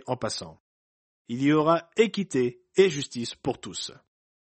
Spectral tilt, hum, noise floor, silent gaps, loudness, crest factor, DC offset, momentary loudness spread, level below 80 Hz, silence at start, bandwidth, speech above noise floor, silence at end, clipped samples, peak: -5 dB/octave; none; under -90 dBFS; 0.60-1.25 s; -26 LUFS; 20 dB; under 0.1%; 13 LU; -64 dBFS; 0.05 s; 8.8 kHz; over 64 dB; 0.55 s; under 0.1%; -8 dBFS